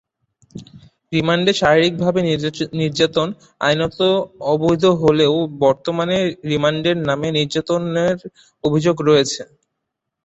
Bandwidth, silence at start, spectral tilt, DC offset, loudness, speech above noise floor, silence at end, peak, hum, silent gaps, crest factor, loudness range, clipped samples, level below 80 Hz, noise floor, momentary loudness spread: 8.2 kHz; 0.55 s; -5.5 dB/octave; under 0.1%; -18 LUFS; 61 dB; 0.8 s; -2 dBFS; none; none; 18 dB; 2 LU; under 0.1%; -52 dBFS; -78 dBFS; 8 LU